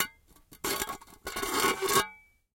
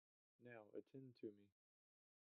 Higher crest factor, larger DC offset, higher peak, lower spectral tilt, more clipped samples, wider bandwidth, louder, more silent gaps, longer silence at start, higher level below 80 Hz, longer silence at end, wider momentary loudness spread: about the same, 24 dB vs 20 dB; neither; first, -8 dBFS vs -42 dBFS; second, -1.5 dB/octave vs -7 dB/octave; neither; first, 17 kHz vs 4 kHz; first, -30 LUFS vs -61 LUFS; neither; second, 0 s vs 0.4 s; first, -56 dBFS vs under -90 dBFS; second, 0.4 s vs 0.85 s; first, 12 LU vs 5 LU